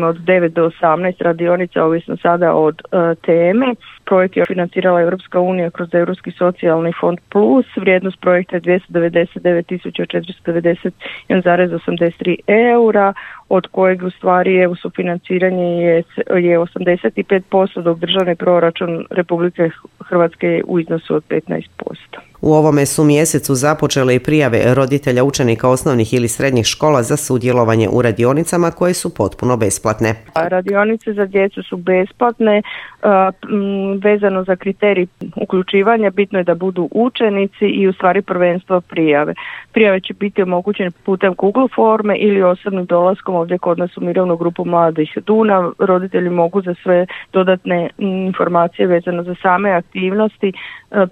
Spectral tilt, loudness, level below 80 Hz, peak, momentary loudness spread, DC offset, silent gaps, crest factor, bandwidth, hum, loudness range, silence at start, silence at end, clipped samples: -5.5 dB/octave; -15 LUFS; -50 dBFS; 0 dBFS; 7 LU; under 0.1%; none; 14 dB; 16 kHz; none; 2 LU; 0 s; 0 s; under 0.1%